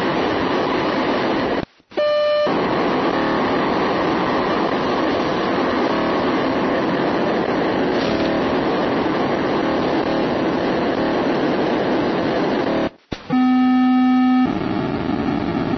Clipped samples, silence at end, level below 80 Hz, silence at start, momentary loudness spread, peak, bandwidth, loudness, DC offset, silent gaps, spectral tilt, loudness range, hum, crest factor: under 0.1%; 0 s; -46 dBFS; 0 s; 5 LU; -6 dBFS; 6.4 kHz; -19 LUFS; under 0.1%; none; -7 dB/octave; 1 LU; none; 12 dB